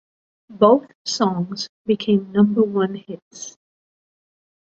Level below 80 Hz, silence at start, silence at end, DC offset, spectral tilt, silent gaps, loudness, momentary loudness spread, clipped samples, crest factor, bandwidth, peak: -64 dBFS; 0.5 s; 1.2 s; under 0.1%; -6 dB/octave; 0.95-1.05 s, 1.69-1.85 s, 3.22-3.31 s; -19 LUFS; 20 LU; under 0.1%; 20 dB; 7.8 kHz; -2 dBFS